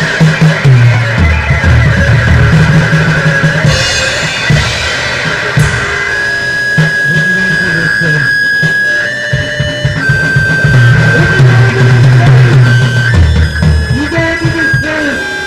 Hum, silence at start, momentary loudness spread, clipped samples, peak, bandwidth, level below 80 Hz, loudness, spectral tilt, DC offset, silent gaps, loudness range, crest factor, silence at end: none; 0 s; 6 LU; 0.8%; 0 dBFS; 12 kHz; -20 dBFS; -8 LUFS; -5.5 dB/octave; under 0.1%; none; 3 LU; 8 dB; 0 s